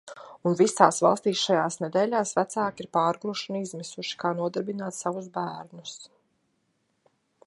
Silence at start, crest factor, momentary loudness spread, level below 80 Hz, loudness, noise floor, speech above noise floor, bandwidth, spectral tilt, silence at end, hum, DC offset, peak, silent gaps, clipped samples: 0.05 s; 26 dB; 16 LU; -76 dBFS; -26 LUFS; -73 dBFS; 47 dB; 11.5 kHz; -4 dB/octave; 1.4 s; none; under 0.1%; -2 dBFS; none; under 0.1%